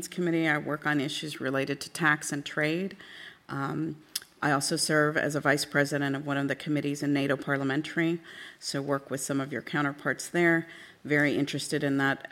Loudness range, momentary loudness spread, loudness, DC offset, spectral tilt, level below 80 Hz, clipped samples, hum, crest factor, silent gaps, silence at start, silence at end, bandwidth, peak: 3 LU; 10 LU; -29 LUFS; under 0.1%; -4.5 dB/octave; -72 dBFS; under 0.1%; none; 20 dB; none; 0 s; 0.05 s; 16 kHz; -10 dBFS